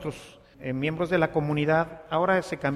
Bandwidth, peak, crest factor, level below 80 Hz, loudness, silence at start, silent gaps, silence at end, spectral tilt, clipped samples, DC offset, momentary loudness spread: 13 kHz; -8 dBFS; 18 dB; -54 dBFS; -26 LUFS; 0 s; none; 0 s; -7 dB/octave; under 0.1%; under 0.1%; 12 LU